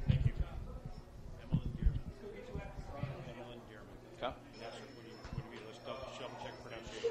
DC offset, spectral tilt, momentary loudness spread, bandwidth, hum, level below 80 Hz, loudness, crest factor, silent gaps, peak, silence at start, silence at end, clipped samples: under 0.1%; -7 dB/octave; 14 LU; 11.5 kHz; none; -46 dBFS; -44 LUFS; 24 dB; none; -16 dBFS; 0 s; 0 s; under 0.1%